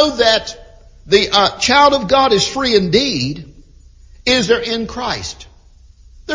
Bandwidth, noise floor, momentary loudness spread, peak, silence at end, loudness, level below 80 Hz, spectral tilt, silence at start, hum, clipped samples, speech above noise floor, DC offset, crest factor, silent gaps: 7.6 kHz; -44 dBFS; 12 LU; 0 dBFS; 0 s; -14 LUFS; -40 dBFS; -3.5 dB/octave; 0 s; none; under 0.1%; 30 dB; under 0.1%; 16 dB; none